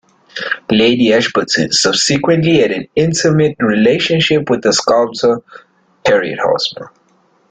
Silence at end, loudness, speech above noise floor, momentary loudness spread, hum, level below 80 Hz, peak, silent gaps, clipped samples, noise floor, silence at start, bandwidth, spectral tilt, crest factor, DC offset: 0.65 s; -13 LUFS; 42 dB; 9 LU; none; -50 dBFS; 0 dBFS; none; under 0.1%; -54 dBFS; 0.35 s; 9.4 kHz; -4 dB/octave; 12 dB; under 0.1%